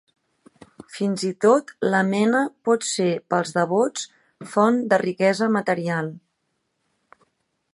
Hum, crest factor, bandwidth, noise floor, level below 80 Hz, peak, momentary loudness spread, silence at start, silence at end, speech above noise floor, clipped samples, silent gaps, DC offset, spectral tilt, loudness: none; 20 dB; 11.5 kHz; -74 dBFS; -72 dBFS; -4 dBFS; 9 LU; 0.9 s; 1.55 s; 53 dB; under 0.1%; none; under 0.1%; -5 dB/octave; -21 LUFS